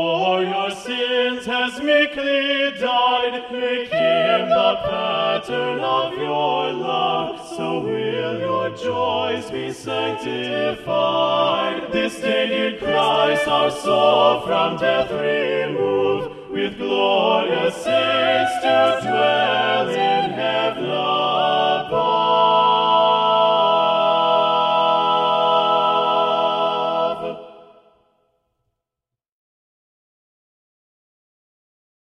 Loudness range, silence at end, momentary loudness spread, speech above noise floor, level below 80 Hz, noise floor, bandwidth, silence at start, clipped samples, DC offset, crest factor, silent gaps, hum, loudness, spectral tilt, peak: 6 LU; 4.4 s; 8 LU; 66 dB; -58 dBFS; -86 dBFS; 12.5 kHz; 0 s; under 0.1%; under 0.1%; 16 dB; none; none; -19 LUFS; -4.5 dB/octave; -2 dBFS